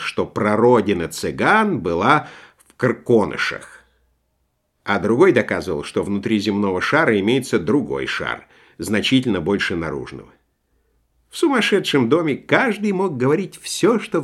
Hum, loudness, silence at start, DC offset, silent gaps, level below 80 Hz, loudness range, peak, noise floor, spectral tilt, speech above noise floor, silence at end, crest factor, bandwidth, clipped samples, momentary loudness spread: none; -19 LUFS; 0 s; under 0.1%; none; -52 dBFS; 4 LU; 0 dBFS; -69 dBFS; -5.5 dB/octave; 50 dB; 0 s; 20 dB; 13.5 kHz; under 0.1%; 10 LU